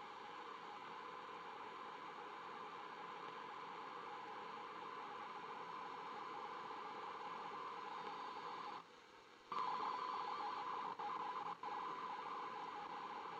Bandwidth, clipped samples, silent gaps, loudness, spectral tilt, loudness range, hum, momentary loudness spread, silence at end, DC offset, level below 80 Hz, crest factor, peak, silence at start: 10 kHz; under 0.1%; none; -49 LUFS; -3.5 dB/octave; 6 LU; none; 7 LU; 0 s; under 0.1%; under -90 dBFS; 20 dB; -28 dBFS; 0 s